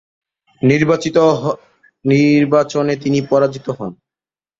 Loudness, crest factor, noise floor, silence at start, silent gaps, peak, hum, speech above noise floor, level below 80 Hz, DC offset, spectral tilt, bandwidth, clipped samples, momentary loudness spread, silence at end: -15 LUFS; 16 dB; under -90 dBFS; 0.65 s; none; 0 dBFS; none; over 76 dB; -56 dBFS; under 0.1%; -7 dB/octave; 7.8 kHz; under 0.1%; 13 LU; 0.65 s